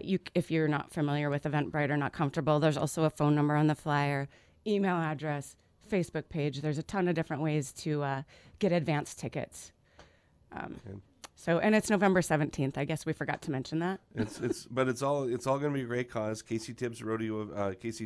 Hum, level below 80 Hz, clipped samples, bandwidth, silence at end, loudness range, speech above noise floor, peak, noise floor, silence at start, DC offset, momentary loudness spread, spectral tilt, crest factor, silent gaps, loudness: none; -62 dBFS; under 0.1%; 11 kHz; 0 s; 5 LU; 32 dB; -12 dBFS; -63 dBFS; 0 s; under 0.1%; 12 LU; -6.5 dB/octave; 20 dB; none; -32 LUFS